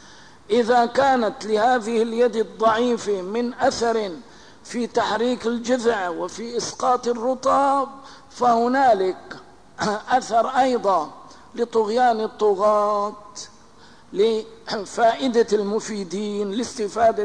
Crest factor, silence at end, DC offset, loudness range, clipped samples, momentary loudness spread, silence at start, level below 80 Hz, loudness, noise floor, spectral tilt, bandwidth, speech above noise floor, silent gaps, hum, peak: 14 dB; 0 s; 0.3%; 3 LU; under 0.1%; 11 LU; 0.5 s; -58 dBFS; -21 LUFS; -49 dBFS; -4 dB/octave; 10.5 kHz; 29 dB; none; none; -8 dBFS